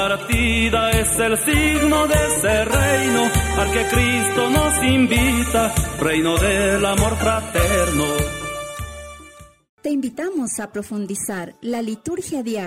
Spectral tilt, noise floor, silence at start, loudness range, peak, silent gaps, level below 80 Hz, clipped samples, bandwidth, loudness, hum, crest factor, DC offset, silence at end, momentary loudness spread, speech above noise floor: -4 dB/octave; -44 dBFS; 0 s; 9 LU; -4 dBFS; 9.69-9.78 s; -30 dBFS; under 0.1%; 16 kHz; -18 LUFS; none; 16 dB; under 0.1%; 0 s; 11 LU; 25 dB